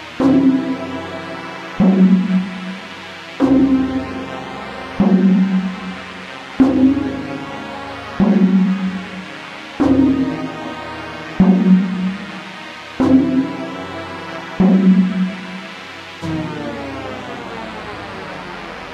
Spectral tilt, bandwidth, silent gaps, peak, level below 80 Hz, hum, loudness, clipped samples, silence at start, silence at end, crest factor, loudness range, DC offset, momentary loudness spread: -8 dB/octave; 7.8 kHz; none; 0 dBFS; -46 dBFS; none; -17 LUFS; under 0.1%; 0 s; 0 s; 16 dB; 2 LU; under 0.1%; 17 LU